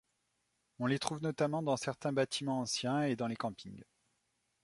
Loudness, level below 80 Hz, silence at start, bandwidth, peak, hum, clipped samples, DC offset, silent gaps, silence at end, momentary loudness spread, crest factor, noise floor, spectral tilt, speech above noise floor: -36 LUFS; -74 dBFS; 0.8 s; 11.5 kHz; -16 dBFS; none; under 0.1%; under 0.1%; none; 0.8 s; 8 LU; 20 dB; -81 dBFS; -5 dB/octave; 45 dB